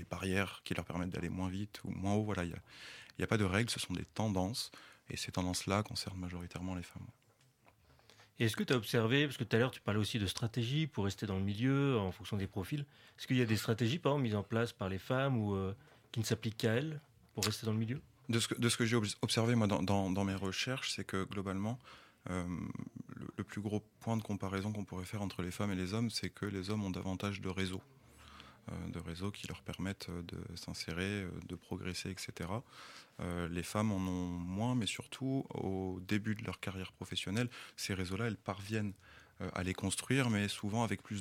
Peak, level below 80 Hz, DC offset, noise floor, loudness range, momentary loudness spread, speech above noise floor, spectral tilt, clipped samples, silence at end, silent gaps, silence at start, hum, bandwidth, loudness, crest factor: -16 dBFS; -64 dBFS; under 0.1%; -69 dBFS; 7 LU; 12 LU; 31 dB; -5 dB/octave; under 0.1%; 0 s; none; 0 s; none; 16.5 kHz; -38 LUFS; 22 dB